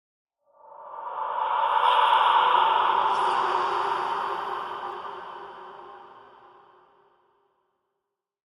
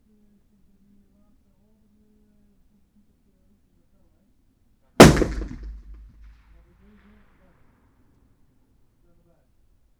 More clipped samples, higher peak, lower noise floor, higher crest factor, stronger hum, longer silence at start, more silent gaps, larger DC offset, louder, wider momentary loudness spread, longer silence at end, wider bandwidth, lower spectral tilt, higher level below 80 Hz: neither; second, -8 dBFS vs 0 dBFS; first, -84 dBFS vs -62 dBFS; second, 18 dB vs 26 dB; neither; second, 0.75 s vs 5 s; neither; neither; second, -24 LUFS vs -15 LUFS; second, 22 LU vs 31 LU; second, 2.3 s vs 4.3 s; second, 11.5 kHz vs over 20 kHz; second, -2.5 dB/octave vs -5 dB/octave; second, -74 dBFS vs -38 dBFS